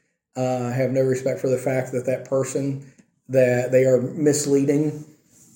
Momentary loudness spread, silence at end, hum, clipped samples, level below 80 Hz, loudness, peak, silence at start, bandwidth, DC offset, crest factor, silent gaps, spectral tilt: 9 LU; 0.5 s; none; under 0.1%; -66 dBFS; -22 LUFS; -6 dBFS; 0.35 s; 17 kHz; under 0.1%; 16 dB; none; -6 dB/octave